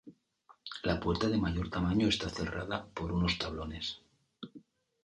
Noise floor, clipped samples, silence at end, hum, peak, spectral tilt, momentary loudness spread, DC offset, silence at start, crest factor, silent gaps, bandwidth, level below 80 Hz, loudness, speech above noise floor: -65 dBFS; under 0.1%; 0.45 s; none; -16 dBFS; -5.5 dB/octave; 20 LU; under 0.1%; 0.05 s; 18 dB; none; 10.5 kHz; -48 dBFS; -33 LUFS; 32 dB